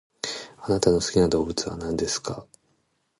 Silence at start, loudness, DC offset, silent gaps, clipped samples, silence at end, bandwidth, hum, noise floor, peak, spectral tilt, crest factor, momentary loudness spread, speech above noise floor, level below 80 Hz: 0.25 s; -25 LUFS; under 0.1%; none; under 0.1%; 0.75 s; 11.5 kHz; none; -70 dBFS; -6 dBFS; -4.5 dB/octave; 20 dB; 13 LU; 47 dB; -46 dBFS